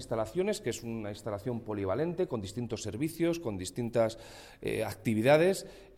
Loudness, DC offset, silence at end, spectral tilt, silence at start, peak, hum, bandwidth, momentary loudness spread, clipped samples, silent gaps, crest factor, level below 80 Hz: -32 LUFS; under 0.1%; 0.1 s; -5.5 dB/octave; 0 s; -12 dBFS; none; 16.5 kHz; 12 LU; under 0.1%; none; 20 dB; -60 dBFS